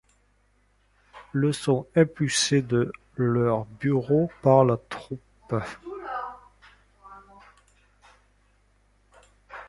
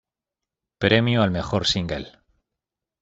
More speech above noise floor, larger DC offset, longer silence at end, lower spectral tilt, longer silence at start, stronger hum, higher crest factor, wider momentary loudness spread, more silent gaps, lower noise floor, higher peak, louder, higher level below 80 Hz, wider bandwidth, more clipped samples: second, 42 dB vs 66 dB; neither; second, 0 s vs 0.9 s; about the same, -5.5 dB/octave vs -5.5 dB/octave; first, 1.15 s vs 0.8 s; first, 50 Hz at -50 dBFS vs none; about the same, 22 dB vs 22 dB; first, 17 LU vs 13 LU; neither; second, -65 dBFS vs -87 dBFS; about the same, -4 dBFS vs -4 dBFS; second, -25 LUFS vs -21 LUFS; second, -58 dBFS vs -48 dBFS; first, 11.5 kHz vs 8 kHz; neither